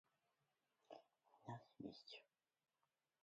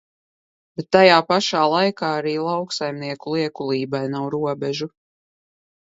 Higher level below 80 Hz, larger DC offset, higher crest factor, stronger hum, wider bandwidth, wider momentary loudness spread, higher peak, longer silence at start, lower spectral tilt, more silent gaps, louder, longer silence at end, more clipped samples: second, under -90 dBFS vs -66 dBFS; neither; about the same, 22 dB vs 22 dB; neither; about the same, 7.4 kHz vs 8 kHz; second, 9 LU vs 14 LU; second, -40 dBFS vs 0 dBFS; about the same, 0.9 s vs 0.8 s; about the same, -4.5 dB/octave vs -5 dB/octave; neither; second, -60 LUFS vs -20 LUFS; about the same, 1 s vs 1.05 s; neither